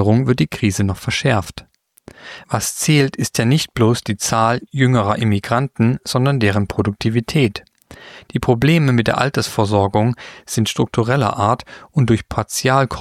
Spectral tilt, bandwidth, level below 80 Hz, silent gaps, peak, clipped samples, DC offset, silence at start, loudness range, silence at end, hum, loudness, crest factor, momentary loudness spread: -5.5 dB/octave; 15 kHz; -44 dBFS; none; -2 dBFS; under 0.1%; under 0.1%; 0 s; 2 LU; 0 s; none; -17 LUFS; 16 dB; 7 LU